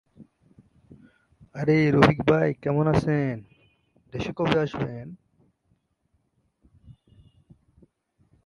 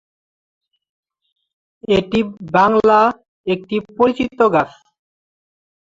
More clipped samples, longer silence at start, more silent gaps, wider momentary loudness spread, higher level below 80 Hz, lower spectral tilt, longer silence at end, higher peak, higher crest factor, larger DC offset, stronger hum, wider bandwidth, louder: neither; second, 0.2 s vs 1.9 s; second, none vs 3.28-3.44 s; first, 20 LU vs 12 LU; about the same, -52 dBFS vs -52 dBFS; about the same, -7.5 dB/octave vs -6.5 dB/octave; first, 1.55 s vs 1.25 s; about the same, -2 dBFS vs -2 dBFS; first, 26 dB vs 18 dB; neither; neither; first, 10.5 kHz vs 7.6 kHz; second, -23 LUFS vs -16 LUFS